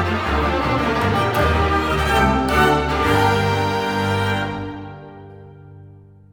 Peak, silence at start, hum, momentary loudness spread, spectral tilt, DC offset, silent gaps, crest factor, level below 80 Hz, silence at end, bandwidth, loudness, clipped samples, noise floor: -2 dBFS; 0 s; 50 Hz at -35 dBFS; 13 LU; -5.5 dB/octave; under 0.1%; none; 18 dB; -30 dBFS; 0.4 s; over 20 kHz; -18 LUFS; under 0.1%; -44 dBFS